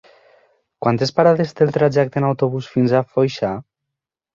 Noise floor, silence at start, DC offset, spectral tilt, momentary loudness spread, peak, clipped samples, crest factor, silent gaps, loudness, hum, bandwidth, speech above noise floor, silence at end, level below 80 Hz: -83 dBFS; 0.8 s; under 0.1%; -7.5 dB/octave; 8 LU; -2 dBFS; under 0.1%; 18 dB; none; -18 LUFS; none; 7.6 kHz; 66 dB; 0.75 s; -56 dBFS